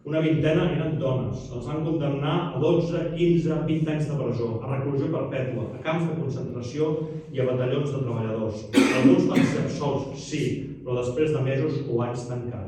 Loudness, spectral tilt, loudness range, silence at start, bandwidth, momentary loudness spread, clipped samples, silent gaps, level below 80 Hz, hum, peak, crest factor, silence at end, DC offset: -25 LUFS; -7 dB/octave; 4 LU; 0.05 s; 13 kHz; 9 LU; under 0.1%; none; -52 dBFS; none; -6 dBFS; 20 dB; 0 s; under 0.1%